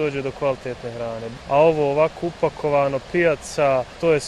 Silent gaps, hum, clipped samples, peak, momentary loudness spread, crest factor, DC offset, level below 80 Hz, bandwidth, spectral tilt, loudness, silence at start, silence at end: none; none; under 0.1%; -4 dBFS; 12 LU; 16 dB; under 0.1%; -48 dBFS; 12 kHz; -5.5 dB/octave; -21 LUFS; 0 s; 0 s